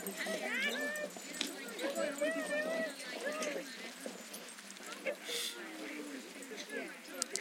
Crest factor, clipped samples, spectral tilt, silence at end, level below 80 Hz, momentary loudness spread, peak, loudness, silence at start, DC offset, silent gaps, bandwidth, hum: 30 dB; under 0.1%; -1.5 dB/octave; 0 s; -88 dBFS; 11 LU; -10 dBFS; -40 LUFS; 0 s; under 0.1%; none; 16.5 kHz; none